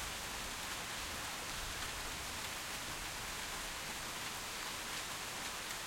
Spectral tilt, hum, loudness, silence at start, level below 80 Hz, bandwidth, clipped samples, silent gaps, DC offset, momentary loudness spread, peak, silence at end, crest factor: -1 dB/octave; none; -41 LUFS; 0 s; -56 dBFS; 16.5 kHz; under 0.1%; none; under 0.1%; 1 LU; -28 dBFS; 0 s; 16 dB